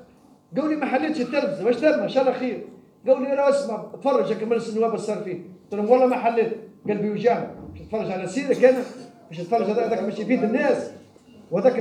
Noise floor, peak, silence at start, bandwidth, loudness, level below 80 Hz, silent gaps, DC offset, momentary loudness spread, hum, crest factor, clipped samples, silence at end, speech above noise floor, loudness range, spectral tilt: -53 dBFS; -4 dBFS; 0 s; 10 kHz; -23 LUFS; -64 dBFS; none; under 0.1%; 14 LU; none; 20 dB; under 0.1%; 0 s; 31 dB; 2 LU; -6.5 dB/octave